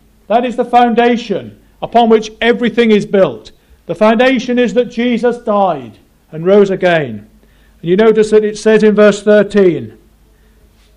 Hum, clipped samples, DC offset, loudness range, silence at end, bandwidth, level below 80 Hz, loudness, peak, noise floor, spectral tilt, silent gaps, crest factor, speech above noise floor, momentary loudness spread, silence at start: none; under 0.1%; under 0.1%; 3 LU; 1.05 s; 10.5 kHz; -46 dBFS; -11 LUFS; 0 dBFS; -47 dBFS; -6 dB/octave; none; 12 dB; 36 dB; 14 LU; 0.3 s